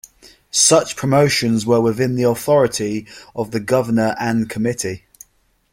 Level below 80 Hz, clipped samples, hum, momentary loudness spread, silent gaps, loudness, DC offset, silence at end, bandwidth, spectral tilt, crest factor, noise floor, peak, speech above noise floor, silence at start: -52 dBFS; under 0.1%; none; 12 LU; none; -17 LUFS; under 0.1%; 0.75 s; 16.5 kHz; -4 dB/octave; 16 dB; -60 dBFS; -2 dBFS; 43 dB; 0.25 s